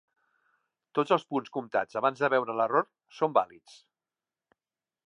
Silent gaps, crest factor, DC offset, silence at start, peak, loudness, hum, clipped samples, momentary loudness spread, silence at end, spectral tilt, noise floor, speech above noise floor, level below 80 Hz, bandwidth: none; 22 dB; under 0.1%; 0.95 s; -8 dBFS; -29 LUFS; none; under 0.1%; 7 LU; 1.6 s; -6 dB/octave; under -90 dBFS; over 61 dB; -82 dBFS; 10.5 kHz